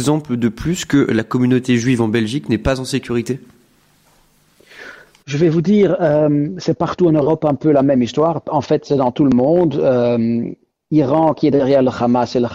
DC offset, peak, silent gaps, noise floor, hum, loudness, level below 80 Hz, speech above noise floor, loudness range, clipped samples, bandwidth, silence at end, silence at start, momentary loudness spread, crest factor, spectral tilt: under 0.1%; -4 dBFS; none; -54 dBFS; none; -16 LUFS; -44 dBFS; 39 dB; 6 LU; under 0.1%; 13 kHz; 0 s; 0 s; 7 LU; 12 dB; -7 dB/octave